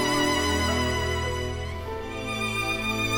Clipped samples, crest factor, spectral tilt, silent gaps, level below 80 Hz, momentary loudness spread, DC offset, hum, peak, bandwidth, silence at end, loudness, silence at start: under 0.1%; 14 dB; -4 dB/octave; none; -38 dBFS; 10 LU; under 0.1%; none; -12 dBFS; 17.5 kHz; 0 s; -26 LUFS; 0 s